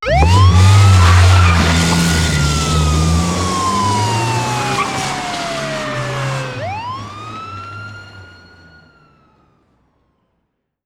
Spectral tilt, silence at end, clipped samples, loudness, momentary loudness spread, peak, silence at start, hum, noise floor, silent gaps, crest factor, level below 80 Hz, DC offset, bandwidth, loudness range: -5 dB/octave; 2.6 s; under 0.1%; -14 LUFS; 19 LU; 0 dBFS; 0 s; none; -70 dBFS; none; 14 dB; -26 dBFS; under 0.1%; 14 kHz; 20 LU